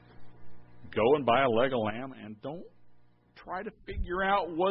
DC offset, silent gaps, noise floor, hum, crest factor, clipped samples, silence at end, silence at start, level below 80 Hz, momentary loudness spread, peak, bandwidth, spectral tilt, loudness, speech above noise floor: under 0.1%; none; -58 dBFS; 60 Hz at -60 dBFS; 18 dB; under 0.1%; 0 s; 0.2 s; -50 dBFS; 17 LU; -12 dBFS; 5.6 kHz; -9.5 dB/octave; -29 LUFS; 29 dB